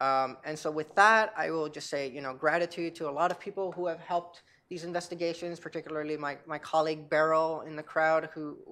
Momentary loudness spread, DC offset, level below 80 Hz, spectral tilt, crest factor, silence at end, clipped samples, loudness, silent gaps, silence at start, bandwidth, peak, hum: 12 LU; under 0.1%; -82 dBFS; -4.5 dB/octave; 22 dB; 0 s; under 0.1%; -30 LUFS; none; 0 s; 12.5 kHz; -8 dBFS; none